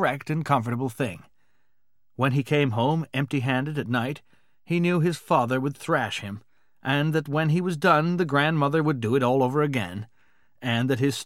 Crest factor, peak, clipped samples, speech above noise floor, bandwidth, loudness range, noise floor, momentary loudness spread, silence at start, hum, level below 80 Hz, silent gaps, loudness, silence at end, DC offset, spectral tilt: 18 dB; -6 dBFS; under 0.1%; 56 dB; 15.5 kHz; 4 LU; -80 dBFS; 11 LU; 0 s; none; -68 dBFS; none; -25 LUFS; 0 s; 0.2%; -6.5 dB/octave